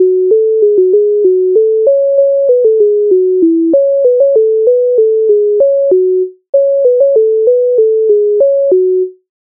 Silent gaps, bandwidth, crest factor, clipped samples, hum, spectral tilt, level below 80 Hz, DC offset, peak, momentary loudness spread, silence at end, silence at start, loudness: 6.49-6.53 s; 1 kHz; 8 dB; under 0.1%; none; -13.5 dB/octave; -66 dBFS; under 0.1%; 0 dBFS; 2 LU; 0.4 s; 0 s; -9 LUFS